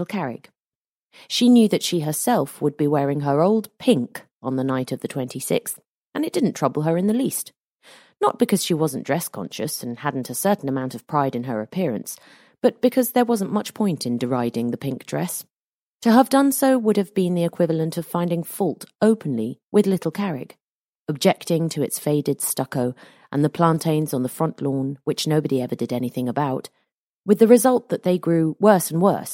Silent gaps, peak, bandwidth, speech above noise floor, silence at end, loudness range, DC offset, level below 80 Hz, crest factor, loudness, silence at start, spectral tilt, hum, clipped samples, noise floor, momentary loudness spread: 0.75-1.10 s, 4.31-4.41 s, 5.86-6.12 s, 7.60-7.80 s, 15.50-16.00 s, 19.63-19.72 s, 20.61-21.06 s, 26.94-27.24 s; 0 dBFS; 16.5 kHz; over 69 dB; 0 s; 4 LU; under 0.1%; -68 dBFS; 20 dB; -21 LUFS; 0 s; -5.5 dB/octave; none; under 0.1%; under -90 dBFS; 11 LU